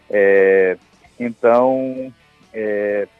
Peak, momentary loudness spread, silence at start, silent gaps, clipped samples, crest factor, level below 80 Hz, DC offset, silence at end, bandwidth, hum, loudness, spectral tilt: -2 dBFS; 17 LU; 0.15 s; none; under 0.1%; 14 dB; -62 dBFS; under 0.1%; 0.15 s; 4.5 kHz; none; -16 LUFS; -8 dB/octave